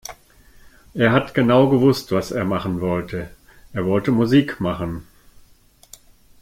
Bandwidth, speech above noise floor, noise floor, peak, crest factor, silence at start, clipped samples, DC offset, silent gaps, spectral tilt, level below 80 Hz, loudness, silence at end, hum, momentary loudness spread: 16 kHz; 34 dB; -52 dBFS; -2 dBFS; 18 dB; 0.1 s; under 0.1%; under 0.1%; none; -7 dB/octave; -48 dBFS; -19 LUFS; 1.4 s; none; 16 LU